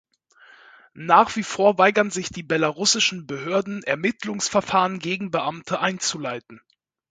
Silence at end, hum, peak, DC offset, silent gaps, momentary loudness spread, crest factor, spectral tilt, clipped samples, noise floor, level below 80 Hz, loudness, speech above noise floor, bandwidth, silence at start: 0.55 s; none; -2 dBFS; under 0.1%; none; 11 LU; 22 dB; -3 dB/octave; under 0.1%; -53 dBFS; -62 dBFS; -22 LUFS; 31 dB; 9.6 kHz; 0.95 s